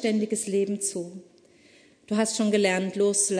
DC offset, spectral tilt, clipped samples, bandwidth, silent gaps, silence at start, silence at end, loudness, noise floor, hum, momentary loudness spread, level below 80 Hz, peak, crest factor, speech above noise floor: under 0.1%; -3.5 dB/octave; under 0.1%; 11 kHz; none; 0 s; 0 s; -25 LUFS; -57 dBFS; none; 8 LU; -76 dBFS; -10 dBFS; 16 dB; 32 dB